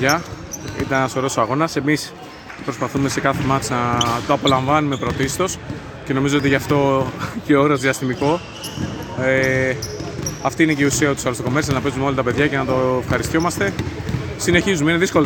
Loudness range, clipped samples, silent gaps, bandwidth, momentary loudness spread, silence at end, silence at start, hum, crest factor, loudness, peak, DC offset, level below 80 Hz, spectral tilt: 2 LU; under 0.1%; none; 18 kHz; 11 LU; 0 s; 0 s; none; 18 dB; -19 LUFS; 0 dBFS; under 0.1%; -40 dBFS; -5 dB/octave